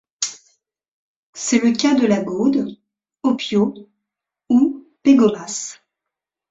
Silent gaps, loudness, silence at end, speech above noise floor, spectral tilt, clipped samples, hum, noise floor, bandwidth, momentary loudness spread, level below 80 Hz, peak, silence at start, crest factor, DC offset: 0.88-1.33 s; -18 LUFS; 0.75 s; 67 dB; -4.5 dB/octave; under 0.1%; none; -84 dBFS; 8 kHz; 12 LU; -62 dBFS; -2 dBFS; 0.2 s; 18 dB; under 0.1%